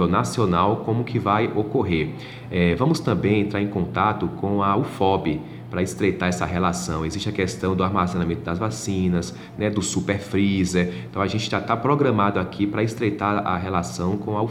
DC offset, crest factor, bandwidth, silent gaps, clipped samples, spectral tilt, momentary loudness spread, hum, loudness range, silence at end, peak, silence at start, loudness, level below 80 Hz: under 0.1%; 18 dB; 13.5 kHz; none; under 0.1%; -6 dB/octave; 6 LU; none; 2 LU; 0 s; -4 dBFS; 0 s; -23 LUFS; -46 dBFS